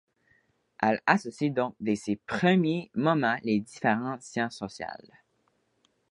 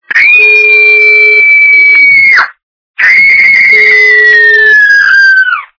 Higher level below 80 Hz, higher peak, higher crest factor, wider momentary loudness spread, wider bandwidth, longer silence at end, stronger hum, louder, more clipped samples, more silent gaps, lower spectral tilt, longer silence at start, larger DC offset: second, -68 dBFS vs -50 dBFS; second, -6 dBFS vs 0 dBFS; first, 24 dB vs 4 dB; first, 12 LU vs 3 LU; first, 11 kHz vs 5.4 kHz; first, 1.15 s vs 0.15 s; neither; second, -28 LUFS vs -1 LUFS; second, under 0.1% vs 8%; second, none vs 2.63-2.94 s; first, -6 dB/octave vs -1 dB/octave; first, 0.8 s vs 0.1 s; neither